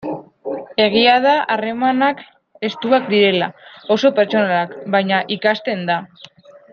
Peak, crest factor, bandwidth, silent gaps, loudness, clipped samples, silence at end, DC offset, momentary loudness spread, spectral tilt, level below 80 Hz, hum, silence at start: -2 dBFS; 16 dB; 6.8 kHz; none; -17 LUFS; under 0.1%; 0.65 s; under 0.1%; 14 LU; -6 dB/octave; -64 dBFS; none; 0 s